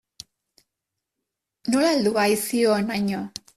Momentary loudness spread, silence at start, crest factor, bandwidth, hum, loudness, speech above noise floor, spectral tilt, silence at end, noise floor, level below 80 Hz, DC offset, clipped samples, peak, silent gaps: 8 LU; 1.65 s; 16 dB; 15.5 kHz; none; -22 LUFS; 62 dB; -4.5 dB/octave; 0.3 s; -84 dBFS; -64 dBFS; under 0.1%; under 0.1%; -8 dBFS; none